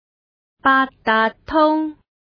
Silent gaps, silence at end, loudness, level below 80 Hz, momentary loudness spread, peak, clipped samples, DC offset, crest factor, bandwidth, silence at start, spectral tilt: none; 0.4 s; -18 LUFS; -50 dBFS; 6 LU; -4 dBFS; under 0.1%; under 0.1%; 16 dB; 5.4 kHz; 0.65 s; -6.5 dB/octave